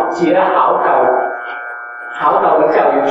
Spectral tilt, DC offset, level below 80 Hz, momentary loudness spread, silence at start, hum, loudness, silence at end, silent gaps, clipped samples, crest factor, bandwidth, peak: -6 dB/octave; under 0.1%; -68 dBFS; 14 LU; 0 s; none; -13 LUFS; 0 s; none; under 0.1%; 12 dB; 8 kHz; -2 dBFS